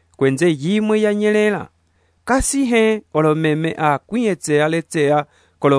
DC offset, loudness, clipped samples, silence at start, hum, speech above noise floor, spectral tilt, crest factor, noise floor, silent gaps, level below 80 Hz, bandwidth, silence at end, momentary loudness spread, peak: under 0.1%; -17 LUFS; under 0.1%; 0.2 s; none; 44 dB; -5.5 dB/octave; 16 dB; -60 dBFS; none; -40 dBFS; 11 kHz; 0 s; 5 LU; -2 dBFS